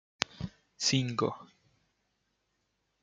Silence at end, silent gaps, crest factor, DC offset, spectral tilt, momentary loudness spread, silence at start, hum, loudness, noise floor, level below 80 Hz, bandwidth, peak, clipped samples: 1.55 s; none; 34 dB; under 0.1%; -3.5 dB/octave; 16 LU; 0.2 s; none; -32 LUFS; -79 dBFS; -64 dBFS; 9.4 kHz; -2 dBFS; under 0.1%